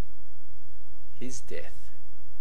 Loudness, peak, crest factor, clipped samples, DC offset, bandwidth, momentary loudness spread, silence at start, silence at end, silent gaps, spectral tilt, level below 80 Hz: -43 LUFS; -14 dBFS; 20 dB; under 0.1%; 10%; 14 kHz; 16 LU; 0 s; 0 s; none; -5 dB/octave; -54 dBFS